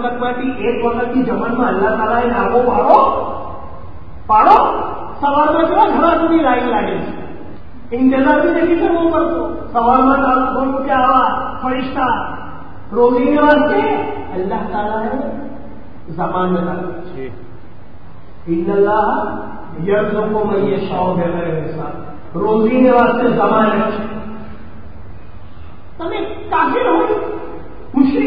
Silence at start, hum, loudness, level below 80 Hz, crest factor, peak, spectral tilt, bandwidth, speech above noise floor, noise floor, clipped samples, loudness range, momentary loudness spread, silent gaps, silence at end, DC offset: 0 s; none; -15 LUFS; -40 dBFS; 16 dB; 0 dBFS; -9.5 dB/octave; 5.2 kHz; 25 dB; -39 dBFS; under 0.1%; 7 LU; 19 LU; none; 0 s; 5%